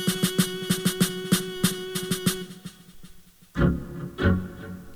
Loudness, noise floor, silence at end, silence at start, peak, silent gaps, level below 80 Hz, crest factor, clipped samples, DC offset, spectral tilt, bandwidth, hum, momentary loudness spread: -26 LUFS; -49 dBFS; 0 s; 0 s; -8 dBFS; none; -40 dBFS; 18 dB; under 0.1%; under 0.1%; -4.5 dB/octave; over 20 kHz; none; 14 LU